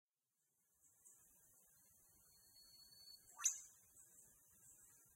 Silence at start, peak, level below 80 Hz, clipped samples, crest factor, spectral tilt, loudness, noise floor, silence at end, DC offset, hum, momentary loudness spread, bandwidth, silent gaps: 0.85 s; -24 dBFS; -90 dBFS; under 0.1%; 32 dB; 2.5 dB/octave; -45 LUFS; -90 dBFS; 0 s; under 0.1%; none; 27 LU; 16 kHz; none